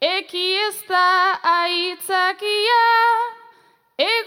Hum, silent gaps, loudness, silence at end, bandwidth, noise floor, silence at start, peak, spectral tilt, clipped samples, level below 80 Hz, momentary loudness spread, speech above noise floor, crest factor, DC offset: none; none; -18 LUFS; 0 s; 17 kHz; -54 dBFS; 0 s; -4 dBFS; 0.5 dB/octave; under 0.1%; -86 dBFS; 7 LU; 36 dB; 16 dB; under 0.1%